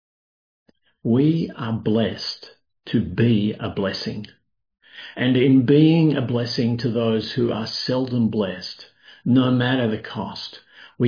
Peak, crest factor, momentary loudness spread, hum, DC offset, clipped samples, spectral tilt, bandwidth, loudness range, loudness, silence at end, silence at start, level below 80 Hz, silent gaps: -4 dBFS; 18 dB; 15 LU; none; under 0.1%; under 0.1%; -7.5 dB/octave; 5.2 kHz; 5 LU; -21 LUFS; 0 s; 1.05 s; -56 dBFS; none